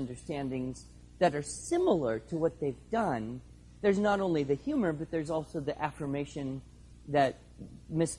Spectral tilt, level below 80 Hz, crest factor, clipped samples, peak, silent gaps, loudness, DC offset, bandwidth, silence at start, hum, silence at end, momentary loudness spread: -6 dB/octave; -56 dBFS; 18 dB; under 0.1%; -14 dBFS; none; -32 LUFS; under 0.1%; 11.5 kHz; 0 s; none; 0 s; 13 LU